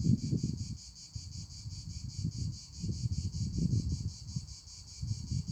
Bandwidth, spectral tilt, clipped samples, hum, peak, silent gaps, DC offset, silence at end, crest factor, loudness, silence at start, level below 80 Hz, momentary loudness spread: 9.6 kHz; -6 dB/octave; under 0.1%; none; -16 dBFS; none; under 0.1%; 0 s; 20 dB; -38 LUFS; 0 s; -46 dBFS; 13 LU